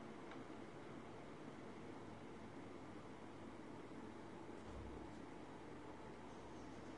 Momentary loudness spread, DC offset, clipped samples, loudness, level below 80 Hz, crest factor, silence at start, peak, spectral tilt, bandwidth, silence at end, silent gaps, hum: 2 LU; under 0.1%; under 0.1%; -56 LUFS; -70 dBFS; 14 dB; 0 s; -40 dBFS; -6 dB/octave; 11 kHz; 0 s; none; none